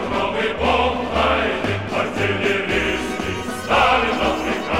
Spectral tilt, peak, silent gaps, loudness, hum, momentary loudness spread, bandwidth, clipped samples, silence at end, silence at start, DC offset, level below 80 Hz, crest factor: -4.5 dB/octave; -4 dBFS; none; -19 LUFS; none; 7 LU; 16.5 kHz; under 0.1%; 0 s; 0 s; 0.6%; -36 dBFS; 16 dB